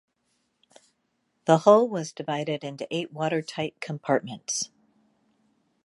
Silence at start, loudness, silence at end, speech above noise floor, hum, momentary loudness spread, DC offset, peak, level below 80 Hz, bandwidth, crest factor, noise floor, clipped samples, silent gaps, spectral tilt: 1.45 s; -26 LUFS; 1.2 s; 49 dB; none; 14 LU; under 0.1%; -4 dBFS; -78 dBFS; 11.5 kHz; 24 dB; -74 dBFS; under 0.1%; none; -4.5 dB/octave